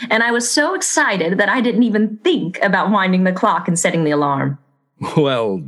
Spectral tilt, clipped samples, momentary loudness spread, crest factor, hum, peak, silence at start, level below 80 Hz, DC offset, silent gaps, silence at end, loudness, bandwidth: -4.5 dB/octave; under 0.1%; 4 LU; 14 dB; none; -2 dBFS; 0 s; -68 dBFS; under 0.1%; none; 0 s; -16 LUFS; 12.5 kHz